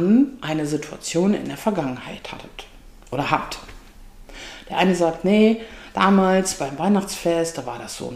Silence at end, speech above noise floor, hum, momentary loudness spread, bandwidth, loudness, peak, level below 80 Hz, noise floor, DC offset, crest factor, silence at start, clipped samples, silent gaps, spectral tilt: 0 s; 22 dB; none; 18 LU; 15.5 kHz; -21 LUFS; -2 dBFS; -46 dBFS; -43 dBFS; 0.1%; 20 dB; 0 s; under 0.1%; none; -5.5 dB/octave